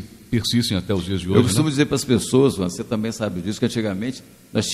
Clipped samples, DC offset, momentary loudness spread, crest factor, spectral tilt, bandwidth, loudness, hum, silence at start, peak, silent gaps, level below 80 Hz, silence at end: under 0.1%; under 0.1%; 8 LU; 20 dB; -5.5 dB/octave; 15.5 kHz; -21 LUFS; none; 0 s; 0 dBFS; none; -46 dBFS; 0 s